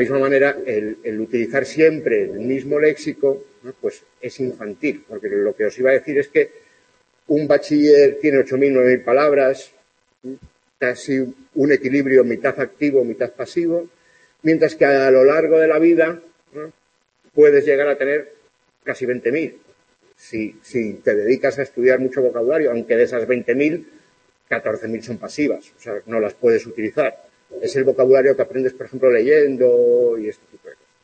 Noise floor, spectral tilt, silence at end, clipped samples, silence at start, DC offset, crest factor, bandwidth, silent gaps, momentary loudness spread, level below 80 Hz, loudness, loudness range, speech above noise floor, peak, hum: -65 dBFS; -6.5 dB/octave; 0.3 s; under 0.1%; 0 s; under 0.1%; 16 dB; 8.6 kHz; none; 15 LU; -66 dBFS; -18 LUFS; 7 LU; 47 dB; -2 dBFS; none